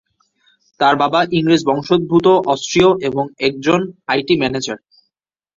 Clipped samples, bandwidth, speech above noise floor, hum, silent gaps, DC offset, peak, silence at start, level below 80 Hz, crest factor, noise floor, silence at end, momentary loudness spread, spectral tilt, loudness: under 0.1%; 7.8 kHz; 60 dB; none; none; under 0.1%; 0 dBFS; 0.8 s; -52 dBFS; 16 dB; -75 dBFS; 0.8 s; 7 LU; -5 dB/octave; -15 LUFS